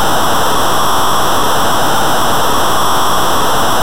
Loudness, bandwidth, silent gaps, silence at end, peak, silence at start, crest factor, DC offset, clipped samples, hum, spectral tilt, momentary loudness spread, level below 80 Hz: -12 LUFS; 16 kHz; none; 0 s; -2 dBFS; 0 s; 6 dB; 30%; under 0.1%; none; -2.5 dB/octave; 0 LU; -32 dBFS